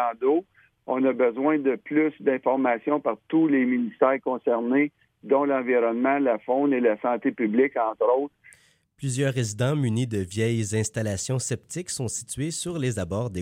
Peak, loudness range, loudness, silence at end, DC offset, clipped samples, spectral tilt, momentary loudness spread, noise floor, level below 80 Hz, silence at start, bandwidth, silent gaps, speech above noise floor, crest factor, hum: -8 dBFS; 4 LU; -25 LUFS; 0 s; under 0.1%; under 0.1%; -6 dB/octave; 7 LU; -58 dBFS; -62 dBFS; 0 s; 16 kHz; none; 34 dB; 16 dB; none